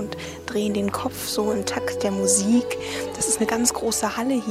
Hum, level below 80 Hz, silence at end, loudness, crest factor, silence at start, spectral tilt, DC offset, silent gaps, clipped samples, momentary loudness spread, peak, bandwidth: none; -52 dBFS; 0 s; -23 LUFS; 20 dB; 0 s; -3.5 dB/octave; under 0.1%; none; under 0.1%; 9 LU; -4 dBFS; 16 kHz